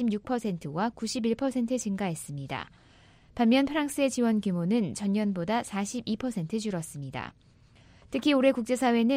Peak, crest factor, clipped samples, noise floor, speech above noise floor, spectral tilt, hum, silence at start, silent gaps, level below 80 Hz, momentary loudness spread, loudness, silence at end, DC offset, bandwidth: -10 dBFS; 18 dB; under 0.1%; -57 dBFS; 29 dB; -5.5 dB/octave; none; 0 s; none; -60 dBFS; 13 LU; -29 LUFS; 0 s; under 0.1%; 16 kHz